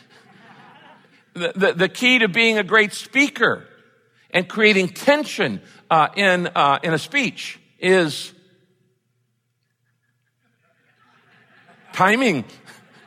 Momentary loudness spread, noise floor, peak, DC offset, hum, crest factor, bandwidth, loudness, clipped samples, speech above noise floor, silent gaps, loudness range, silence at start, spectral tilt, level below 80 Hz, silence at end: 15 LU; -71 dBFS; -4 dBFS; under 0.1%; none; 18 dB; 16 kHz; -18 LUFS; under 0.1%; 52 dB; none; 8 LU; 1.35 s; -4 dB/octave; -70 dBFS; 0.35 s